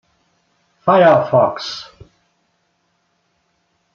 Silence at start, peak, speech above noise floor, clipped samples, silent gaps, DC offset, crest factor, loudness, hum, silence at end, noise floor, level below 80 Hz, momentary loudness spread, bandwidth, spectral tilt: 0.85 s; -2 dBFS; 52 dB; under 0.1%; none; under 0.1%; 18 dB; -14 LUFS; none; 2.1 s; -65 dBFS; -60 dBFS; 16 LU; 7.2 kHz; -6 dB/octave